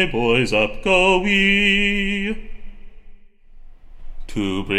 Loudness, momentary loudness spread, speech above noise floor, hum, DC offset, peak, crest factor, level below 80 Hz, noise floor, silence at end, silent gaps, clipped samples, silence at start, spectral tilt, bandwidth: -17 LUFS; 12 LU; 24 dB; none; under 0.1%; -2 dBFS; 18 dB; -32 dBFS; -42 dBFS; 0 s; none; under 0.1%; 0 s; -4.5 dB/octave; 13 kHz